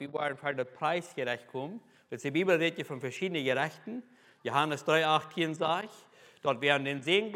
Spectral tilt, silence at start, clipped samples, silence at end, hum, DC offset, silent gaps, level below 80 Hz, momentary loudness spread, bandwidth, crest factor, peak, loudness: -4.5 dB/octave; 0 s; under 0.1%; 0 s; none; under 0.1%; none; -86 dBFS; 14 LU; 16.5 kHz; 22 dB; -10 dBFS; -31 LUFS